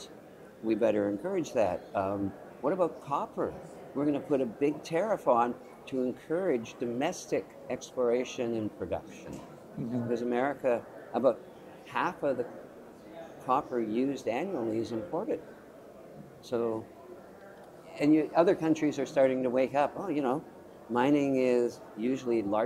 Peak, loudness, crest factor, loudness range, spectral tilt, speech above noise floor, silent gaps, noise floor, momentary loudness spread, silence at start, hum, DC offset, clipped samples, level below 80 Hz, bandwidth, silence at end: -10 dBFS; -31 LUFS; 20 dB; 6 LU; -6.5 dB/octave; 21 dB; none; -51 dBFS; 22 LU; 0 s; none; under 0.1%; under 0.1%; -68 dBFS; 15 kHz; 0 s